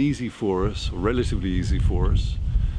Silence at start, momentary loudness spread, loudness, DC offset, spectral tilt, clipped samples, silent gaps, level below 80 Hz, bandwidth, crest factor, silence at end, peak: 0 s; 4 LU; -25 LUFS; under 0.1%; -7 dB/octave; under 0.1%; none; -26 dBFS; 10 kHz; 14 dB; 0 s; -8 dBFS